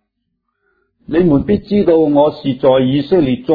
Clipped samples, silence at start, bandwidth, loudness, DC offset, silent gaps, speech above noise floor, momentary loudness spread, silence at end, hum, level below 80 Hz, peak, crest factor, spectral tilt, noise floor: under 0.1%; 1.1 s; 5 kHz; -13 LUFS; under 0.1%; none; 58 dB; 4 LU; 0 s; none; -40 dBFS; 0 dBFS; 14 dB; -10.5 dB/octave; -71 dBFS